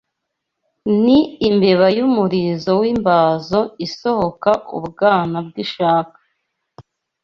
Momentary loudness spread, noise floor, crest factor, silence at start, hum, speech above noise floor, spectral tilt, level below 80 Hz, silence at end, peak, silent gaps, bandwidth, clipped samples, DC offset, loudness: 10 LU; -77 dBFS; 16 dB; 0.85 s; none; 61 dB; -7.5 dB/octave; -52 dBFS; 0.4 s; -2 dBFS; none; 7.2 kHz; under 0.1%; under 0.1%; -16 LUFS